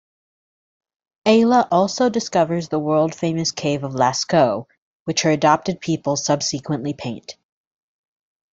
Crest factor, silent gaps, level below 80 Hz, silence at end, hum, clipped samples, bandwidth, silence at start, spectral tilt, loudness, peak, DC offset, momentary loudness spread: 18 dB; 4.78-5.06 s; -60 dBFS; 1.2 s; none; under 0.1%; 7.8 kHz; 1.25 s; -4.5 dB/octave; -19 LUFS; -2 dBFS; under 0.1%; 11 LU